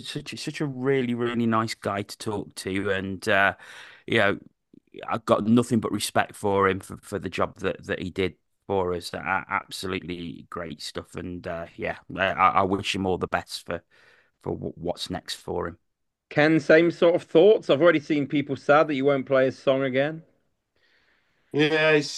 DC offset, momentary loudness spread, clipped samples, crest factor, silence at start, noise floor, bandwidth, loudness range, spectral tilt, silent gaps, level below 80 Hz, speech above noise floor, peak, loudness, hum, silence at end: under 0.1%; 15 LU; under 0.1%; 22 dB; 0 s; -71 dBFS; 12.5 kHz; 9 LU; -5.5 dB/octave; none; -60 dBFS; 47 dB; -4 dBFS; -24 LUFS; none; 0 s